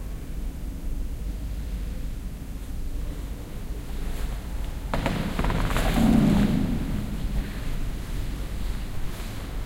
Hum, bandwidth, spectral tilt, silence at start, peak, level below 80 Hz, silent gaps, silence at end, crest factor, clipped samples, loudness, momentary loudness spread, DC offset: none; 16 kHz; -6.5 dB/octave; 0 s; -6 dBFS; -30 dBFS; none; 0 s; 20 dB; under 0.1%; -29 LUFS; 15 LU; under 0.1%